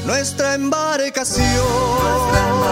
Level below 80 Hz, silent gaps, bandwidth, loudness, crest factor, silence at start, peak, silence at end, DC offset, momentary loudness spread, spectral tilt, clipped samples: -30 dBFS; none; 16 kHz; -17 LUFS; 16 dB; 0 s; -2 dBFS; 0 s; under 0.1%; 3 LU; -4 dB/octave; under 0.1%